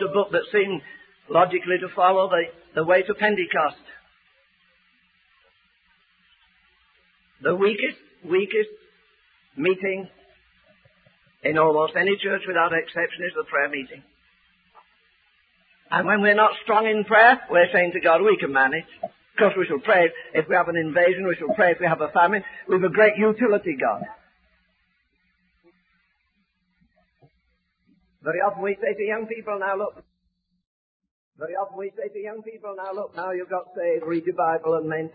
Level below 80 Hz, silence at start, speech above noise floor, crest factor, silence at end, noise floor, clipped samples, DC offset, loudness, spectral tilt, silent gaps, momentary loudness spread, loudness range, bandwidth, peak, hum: -68 dBFS; 0 s; 51 dB; 20 dB; 0.05 s; -73 dBFS; under 0.1%; under 0.1%; -22 LUFS; -9.5 dB/octave; 30.67-31.00 s, 31.11-31.32 s; 14 LU; 13 LU; 4.9 kHz; -4 dBFS; none